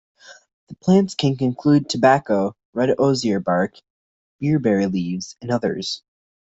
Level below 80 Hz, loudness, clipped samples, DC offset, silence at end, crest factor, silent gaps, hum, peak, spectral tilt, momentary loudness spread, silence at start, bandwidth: -58 dBFS; -20 LUFS; under 0.1%; under 0.1%; 0.55 s; 18 dB; 0.53-0.67 s, 2.65-2.73 s, 3.90-4.39 s; none; -4 dBFS; -6 dB/octave; 10 LU; 0.3 s; 8.2 kHz